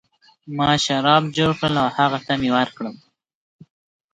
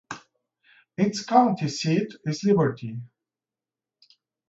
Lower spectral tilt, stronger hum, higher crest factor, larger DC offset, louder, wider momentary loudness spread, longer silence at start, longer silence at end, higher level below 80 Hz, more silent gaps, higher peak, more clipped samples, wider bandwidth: about the same, -5 dB/octave vs -6 dB/octave; neither; about the same, 20 dB vs 22 dB; neither; first, -19 LUFS vs -24 LUFS; second, 12 LU vs 20 LU; first, 0.45 s vs 0.1 s; second, 1.2 s vs 1.45 s; first, -52 dBFS vs -68 dBFS; neither; about the same, -2 dBFS vs -4 dBFS; neither; first, 9.4 kHz vs 8 kHz